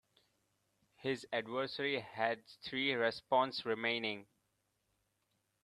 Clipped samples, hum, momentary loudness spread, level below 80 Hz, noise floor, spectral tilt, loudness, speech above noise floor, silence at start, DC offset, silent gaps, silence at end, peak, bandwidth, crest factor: under 0.1%; none; 9 LU; -82 dBFS; -82 dBFS; -5 dB/octave; -37 LUFS; 45 dB; 1 s; under 0.1%; none; 1.4 s; -18 dBFS; 13 kHz; 22 dB